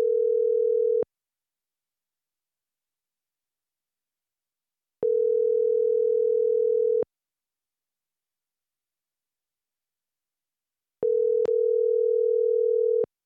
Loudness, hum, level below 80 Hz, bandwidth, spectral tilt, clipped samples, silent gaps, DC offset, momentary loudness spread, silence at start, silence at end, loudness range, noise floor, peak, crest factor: -24 LUFS; none; -80 dBFS; 1.6 kHz; -8.5 dB/octave; under 0.1%; none; under 0.1%; 4 LU; 0 s; 0.2 s; 9 LU; under -90 dBFS; -16 dBFS; 12 dB